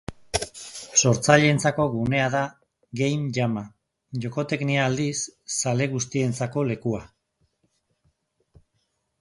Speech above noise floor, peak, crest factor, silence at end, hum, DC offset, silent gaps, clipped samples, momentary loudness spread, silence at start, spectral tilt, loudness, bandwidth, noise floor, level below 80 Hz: 50 dB; -2 dBFS; 22 dB; 2.15 s; none; under 0.1%; none; under 0.1%; 15 LU; 0.1 s; -4.5 dB/octave; -24 LUFS; 11.5 kHz; -74 dBFS; -54 dBFS